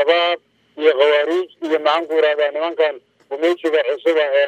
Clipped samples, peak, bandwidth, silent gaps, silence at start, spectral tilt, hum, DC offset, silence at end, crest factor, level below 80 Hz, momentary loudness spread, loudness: under 0.1%; -2 dBFS; 8.8 kHz; none; 0 s; -2.5 dB/octave; none; under 0.1%; 0 s; 16 dB; -80 dBFS; 7 LU; -18 LUFS